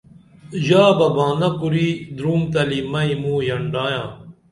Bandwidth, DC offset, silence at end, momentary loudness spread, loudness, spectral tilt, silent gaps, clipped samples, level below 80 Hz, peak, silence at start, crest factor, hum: 11.5 kHz; under 0.1%; 0.2 s; 11 LU; -19 LUFS; -7 dB/octave; none; under 0.1%; -52 dBFS; -2 dBFS; 0.45 s; 18 dB; none